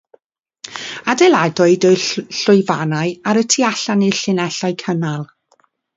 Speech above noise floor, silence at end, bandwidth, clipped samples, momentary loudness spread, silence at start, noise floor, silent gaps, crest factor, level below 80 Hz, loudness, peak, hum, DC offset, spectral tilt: 44 dB; 0.7 s; 7.8 kHz; under 0.1%; 15 LU; 0.65 s; -59 dBFS; none; 16 dB; -64 dBFS; -15 LUFS; 0 dBFS; none; under 0.1%; -4.5 dB/octave